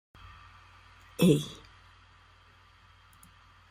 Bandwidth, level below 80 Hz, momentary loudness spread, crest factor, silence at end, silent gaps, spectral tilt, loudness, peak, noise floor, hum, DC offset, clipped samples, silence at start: 16 kHz; -60 dBFS; 28 LU; 24 dB; 2.15 s; none; -6.5 dB/octave; -27 LUFS; -10 dBFS; -59 dBFS; none; under 0.1%; under 0.1%; 1.2 s